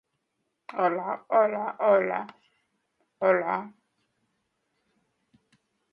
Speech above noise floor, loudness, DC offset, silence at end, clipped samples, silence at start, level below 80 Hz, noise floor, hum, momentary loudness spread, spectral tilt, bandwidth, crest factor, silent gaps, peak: 54 dB; -26 LUFS; under 0.1%; 2.2 s; under 0.1%; 0.75 s; -82 dBFS; -79 dBFS; none; 13 LU; -8.5 dB/octave; 5.4 kHz; 20 dB; none; -8 dBFS